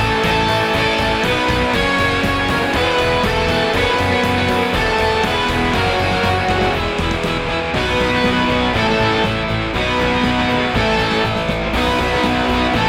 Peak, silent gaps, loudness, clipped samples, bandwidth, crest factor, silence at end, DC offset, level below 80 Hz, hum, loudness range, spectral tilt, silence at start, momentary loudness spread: -2 dBFS; none; -16 LUFS; under 0.1%; 16.5 kHz; 14 dB; 0 s; under 0.1%; -30 dBFS; none; 1 LU; -5 dB/octave; 0 s; 3 LU